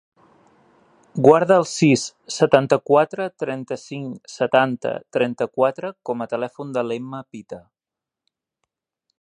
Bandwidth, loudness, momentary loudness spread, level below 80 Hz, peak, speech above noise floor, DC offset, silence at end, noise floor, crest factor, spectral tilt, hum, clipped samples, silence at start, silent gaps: 11 kHz; -20 LUFS; 18 LU; -66 dBFS; 0 dBFS; 67 dB; under 0.1%; 1.6 s; -87 dBFS; 22 dB; -5.5 dB/octave; none; under 0.1%; 1.15 s; none